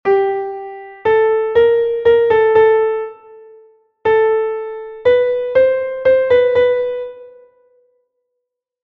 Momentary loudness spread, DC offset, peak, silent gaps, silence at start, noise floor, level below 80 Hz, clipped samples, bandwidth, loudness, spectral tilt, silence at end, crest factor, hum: 14 LU; under 0.1%; 0 dBFS; none; 0.05 s; -77 dBFS; -52 dBFS; under 0.1%; 4.6 kHz; -14 LUFS; -6.5 dB/octave; 1.55 s; 14 dB; none